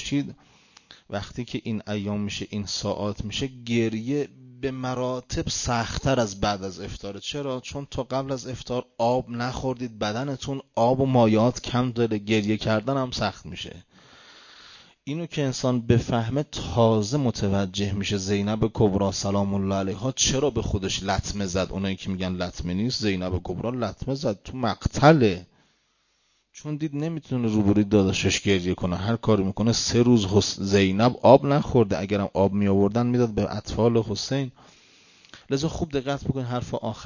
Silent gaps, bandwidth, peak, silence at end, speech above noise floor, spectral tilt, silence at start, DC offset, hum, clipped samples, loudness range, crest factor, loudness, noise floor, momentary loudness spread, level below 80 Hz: none; 7.4 kHz; -2 dBFS; 0 s; 44 dB; -5.5 dB/octave; 0 s; under 0.1%; none; under 0.1%; 8 LU; 22 dB; -25 LUFS; -68 dBFS; 11 LU; -44 dBFS